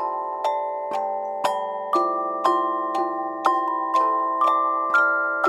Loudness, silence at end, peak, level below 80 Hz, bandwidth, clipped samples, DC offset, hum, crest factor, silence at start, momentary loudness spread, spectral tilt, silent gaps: -23 LUFS; 0 s; -4 dBFS; -82 dBFS; 15 kHz; under 0.1%; under 0.1%; none; 20 dB; 0 s; 7 LU; -3.5 dB/octave; none